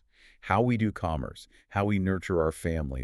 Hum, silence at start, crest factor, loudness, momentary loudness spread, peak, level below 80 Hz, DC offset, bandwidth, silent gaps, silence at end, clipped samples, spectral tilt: none; 0.45 s; 20 dB; -29 LUFS; 12 LU; -8 dBFS; -44 dBFS; under 0.1%; 13 kHz; none; 0 s; under 0.1%; -7.5 dB/octave